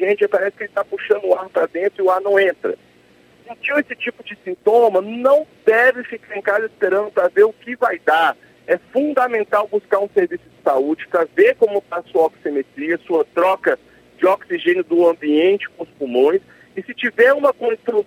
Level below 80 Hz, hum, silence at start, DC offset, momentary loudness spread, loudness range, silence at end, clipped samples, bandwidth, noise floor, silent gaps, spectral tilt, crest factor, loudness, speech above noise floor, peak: -68 dBFS; none; 0 s; under 0.1%; 11 LU; 2 LU; 0.05 s; under 0.1%; 16 kHz; -51 dBFS; none; -5.5 dB/octave; 18 dB; -18 LUFS; 34 dB; 0 dBFS